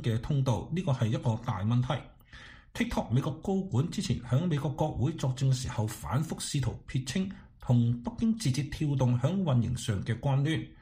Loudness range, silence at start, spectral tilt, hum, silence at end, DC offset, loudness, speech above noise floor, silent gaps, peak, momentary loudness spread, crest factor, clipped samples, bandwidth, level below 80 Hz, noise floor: 2 LU; 0 s; -6.5 dB/octave; none; 0.1 s; under 0.1%; -31 LUFS; 22 dB; none; -14 dBFS; 7 LU; 16 dB; under 0.1%; 15.5 kHz; -50 dBFS; -51 dBFS